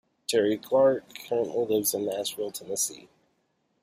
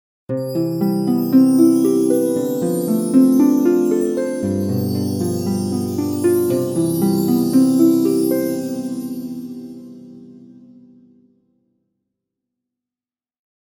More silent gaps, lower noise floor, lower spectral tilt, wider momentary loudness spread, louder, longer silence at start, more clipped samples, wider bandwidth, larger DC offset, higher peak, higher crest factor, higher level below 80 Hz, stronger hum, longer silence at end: neither; second, -73 dBFS vs under -90 dBFS; second, -3 dB/octave vs -7 dB/octave; second, 9 LU vs 13 LU; second, -27 LUFS vs -17 LUFS; about the same, 0.3 s vs 0.3 s; neither; second, 15.5 kHz vs 18.5 kHz; neither; second, -12 dBFS vs -2 dBFS; about the same, 16 dB vs 16 dB; second, -70 dBFS vs -64 dBFS; neither; second, 0.75 s vs 3.35 s